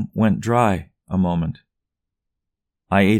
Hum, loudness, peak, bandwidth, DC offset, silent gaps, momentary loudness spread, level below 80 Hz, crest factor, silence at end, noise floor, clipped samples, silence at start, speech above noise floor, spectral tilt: none; -21 LUFS; -4 dBFS; 13.5 kHz; under 0.1%; none; 10 LU; -46 dBFS; 18 dB; 0 s; -82 dBFS; under 0.1%; 0 s; 64 dB; -7.5 dB/octave